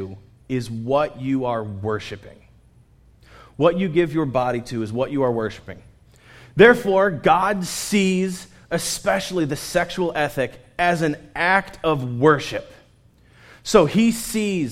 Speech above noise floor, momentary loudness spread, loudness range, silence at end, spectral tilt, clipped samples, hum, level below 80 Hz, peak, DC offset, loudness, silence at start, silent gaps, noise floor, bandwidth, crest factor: 34 dB; 11 LU; 6 LU; 0 s; -5 dB/octave; under 0.1%; none; -50 dBFS; 0 dBFS; under 0.1%; -21 LUFS; 0 s; none; -54 dBFS; 16 kHz; 20 dB